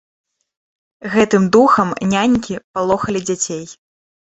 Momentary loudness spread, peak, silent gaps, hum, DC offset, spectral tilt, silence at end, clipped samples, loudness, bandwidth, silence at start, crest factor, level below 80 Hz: 14 LU; -2 dBFS; 2.64-2.74 s; none; under 0.1%; -5 dB/octave; 0.6 s; under 0.1%; -16 LUFS; 8.2 kHz; 1.05 s; 16 dB; -50 dBFS